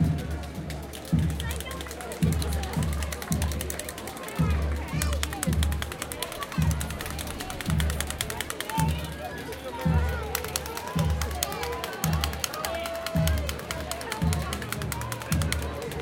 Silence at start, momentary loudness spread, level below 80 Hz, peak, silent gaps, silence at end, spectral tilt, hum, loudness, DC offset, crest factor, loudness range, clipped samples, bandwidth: 0 s; 8 LU; -34 dBFS; -2 dBFS; none; 0 s; -4.5 dB/octave; none; -30 LUFS; under 0.1%; 26 dB; 1 LU; under 0.1%; 17 kHz